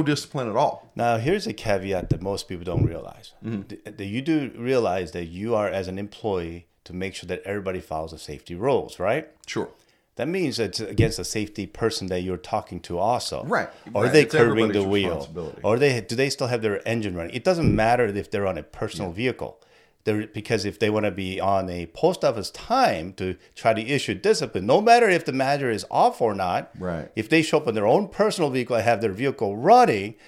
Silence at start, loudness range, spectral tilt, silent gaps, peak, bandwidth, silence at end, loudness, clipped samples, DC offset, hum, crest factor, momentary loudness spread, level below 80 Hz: 0 s; 7 LU; -5.5 dB/octave; none; -4 dBFS; 15.5 kHz; 0.15 s; -24 LUFS; under 0.1%; under 0.1%; none; 20 dB; 12 LU; -48 dBFS